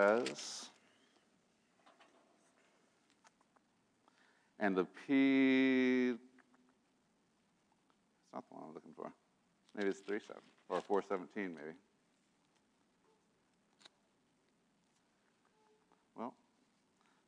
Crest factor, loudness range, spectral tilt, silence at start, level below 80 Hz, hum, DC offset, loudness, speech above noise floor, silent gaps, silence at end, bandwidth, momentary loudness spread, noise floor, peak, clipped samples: 22 dB; 22 LU; -5 dB/octave; 0 s; under -90 dBFS; none; under 0.1%; -36 LUFS; 41 dB; none; 0.95 s; 10 kHz; 22 LU; -77 dBFS; -20 dBFS; under 0.1%